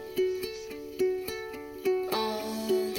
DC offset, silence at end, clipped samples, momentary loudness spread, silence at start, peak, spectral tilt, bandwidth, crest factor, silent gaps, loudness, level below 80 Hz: under 0.1%; 0 s; under 0.1%; 10 LU; 0 s; -16 dBFS; -4 dB/octave; 17 kHz; 16 dB; none; -32 LUFS; -62 dBFS